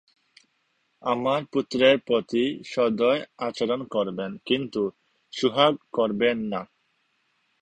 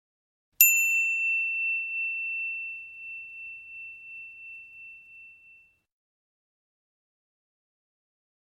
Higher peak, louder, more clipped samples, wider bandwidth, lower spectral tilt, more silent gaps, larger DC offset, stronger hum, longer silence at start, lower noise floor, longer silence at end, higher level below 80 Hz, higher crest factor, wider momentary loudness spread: about the same, -4 dBFS vs -2 dBFS; about the same, -25 LUFS vs -23 LUFS; neither; second, 9.4 kHz vs 16 kHz; first, -5.5 dB/octave vs 5 dB/octave; neither; neither; neither; first, 1.05 s vs 0.6 s; first, -71 dBFS vs -58 dBFS; second, 0.95 s vs 3.15 s; first, -66 dBFS vs -80 dBFS; second, 22 dB vs 30 dB; second, 11 LU vs 24 LU